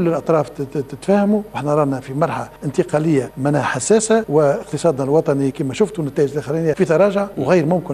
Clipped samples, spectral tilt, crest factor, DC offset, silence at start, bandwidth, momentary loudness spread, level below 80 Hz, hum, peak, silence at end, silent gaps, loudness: under 0.1%; -6 dB/octave; 14 dB; under 0.1%; 0 s; 14 kHz; 6 LU; -50 dBFS; none; -2 dBFS; 0 s; none; -18 LUFS